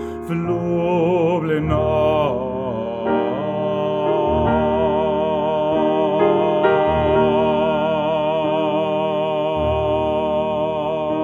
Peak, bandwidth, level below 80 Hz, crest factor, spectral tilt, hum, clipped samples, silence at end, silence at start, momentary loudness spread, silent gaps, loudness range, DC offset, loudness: -4 dBFS; 7 kHz; -38 dBFS; 14 dB; -8.5 dB/octave; none; under 0.1%; 0 s; 0 s; 5 LU; none; 2 LU; under 0.1%; -19 LUFS